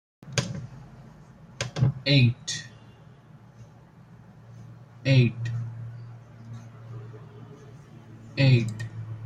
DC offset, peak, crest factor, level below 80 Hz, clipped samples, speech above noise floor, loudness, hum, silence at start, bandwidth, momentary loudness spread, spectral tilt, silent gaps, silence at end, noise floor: under 0.1%; -8 dBFS; 20 dB; -56 dBFS; under 0.1%; 29 dB; -25 LUFS; none; 0.25 s; 10.5 kHz; 26 LU; -5.5 dB/octave; none; 0 s; -51 dBFS